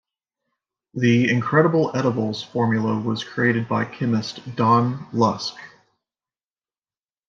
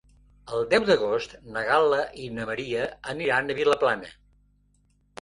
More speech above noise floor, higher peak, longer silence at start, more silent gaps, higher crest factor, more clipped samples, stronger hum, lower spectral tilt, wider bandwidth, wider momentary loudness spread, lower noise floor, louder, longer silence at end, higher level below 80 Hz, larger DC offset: first, over 70 dB vs 40 dB; first, -4 dBFS vs -8 dBFS; first, 0.95 s vs 0.45 s; neither; about the same, 20 dB vs 20 dB; neither; second, none vs 50 Hz at -60 dBFS; first, -6.5 dB/octave vs -4.5 dB/octave; second, 7.4 kHz vs 11 kHz; second, 8 LU vs 12 LU; first, under -90 dBFS vs -65 dBFS; first, -21 LUFS vs -25 LUFS; first, 1.6 s vs 1.1 s; second, -66 dBFS vs -58 dBFS; neither